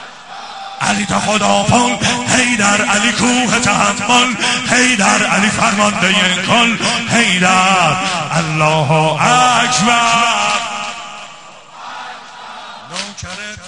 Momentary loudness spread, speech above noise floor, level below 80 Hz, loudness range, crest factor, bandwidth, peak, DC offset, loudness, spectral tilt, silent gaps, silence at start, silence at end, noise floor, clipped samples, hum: 19 LU; 23 dB; -46 dBFS; 4 LU; 14 dB; 10.5 kHz; 0 dBFS; 0.3%; -12 LUFS; -3 dB/octave; none; 0 s; 0 s; -36 dBFS; under 0.1%; none